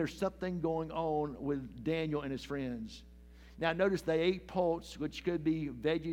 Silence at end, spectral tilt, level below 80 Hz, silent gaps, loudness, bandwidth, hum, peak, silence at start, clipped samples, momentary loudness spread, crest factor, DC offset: 0 s; -6.5 dB/octave; -56 dBFS; none; -35 LUFS; 16 kHz; none; -16 dBFS; 0 s; under 0.1%; 8 LU; 20 dB; under 0.1%